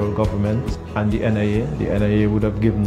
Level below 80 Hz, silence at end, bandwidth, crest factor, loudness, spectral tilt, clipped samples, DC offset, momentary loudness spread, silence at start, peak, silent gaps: -32 dBFS; 0 s; 9.4 kHz; 14 dB; -20 LUFS; -8.5 dB/octave; under 0.1%; under 0.1%; 5 LU; 0 s; -4 dBFS; none